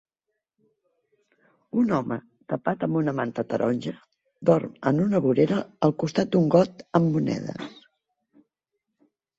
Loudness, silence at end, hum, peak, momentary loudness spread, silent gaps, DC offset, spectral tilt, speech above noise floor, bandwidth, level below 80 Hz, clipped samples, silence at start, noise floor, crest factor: -24 LUFS; 1.65 s; none; -4 dBFS; 12 LU; none; under 0.1%; -8 dB/octave; 59 dB; 7.8 kHz; -64 dBFS; under 0.1%; 1.75 s; -83 dBFS; 20 dB